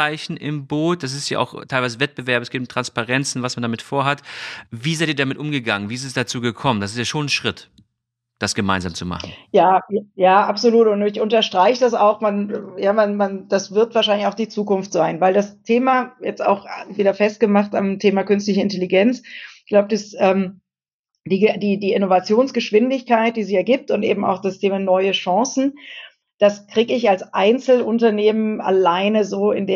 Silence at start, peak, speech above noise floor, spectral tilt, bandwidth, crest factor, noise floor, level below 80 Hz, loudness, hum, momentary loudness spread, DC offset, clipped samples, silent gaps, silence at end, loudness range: 0 s; -2 dBFS; 59 dB; -5 dB/octave; 12 kHz; 16 dB; -77 dBFS; -60 dBFS; -19 LUFS; none; 9 LU; under 0.1%; under 0.1%; 20.94-21.04 s, 26.34-26.38 s; 0 s; 5 LU